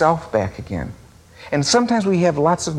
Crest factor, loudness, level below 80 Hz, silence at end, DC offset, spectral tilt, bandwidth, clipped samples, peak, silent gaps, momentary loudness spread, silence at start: 16 dB; -19 LUFS; -46 dBFS; 0 s; under 0.1%; -5 dB/octave; 13 kHz; under 0.1%; -2 dBFS; none; 12 LU; 0 s